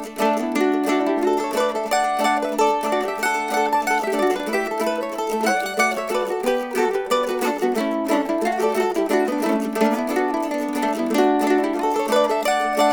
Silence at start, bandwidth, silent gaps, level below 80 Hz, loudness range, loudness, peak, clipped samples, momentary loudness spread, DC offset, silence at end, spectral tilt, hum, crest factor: 0 s; over 20 kHz; none; -56 dBFS; 1 LU; -21 LUFS; -6 dBFS; under 0.1%; 4 LU; under 0.1%; 0 s; -3.5 dB/octave; none; 16 dB